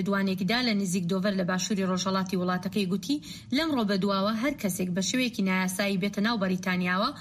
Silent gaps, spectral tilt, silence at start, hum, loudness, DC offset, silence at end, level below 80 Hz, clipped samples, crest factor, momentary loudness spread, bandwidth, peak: none; -4.5 dB/octave; 0 s; none; -27 LUFS; under 0.1%; 0 s; -62 dBFS; under 0.1%; 14 dB; 3 LU; 15.5 kHz; -14 dBFS